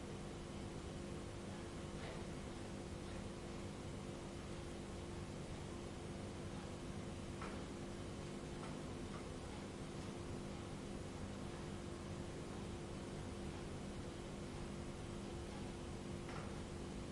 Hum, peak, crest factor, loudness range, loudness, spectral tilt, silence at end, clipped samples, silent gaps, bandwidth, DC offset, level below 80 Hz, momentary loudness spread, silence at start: 50 Hz at -60 dBFS; -36 dBFS; 14 dB; 1 LU; -49 LUFS; -5.5 dB/octave; 0 s; under 0.1%; none; 11.5 kHz; under 0.1%; -58 dBFS; 1 LU; 0 s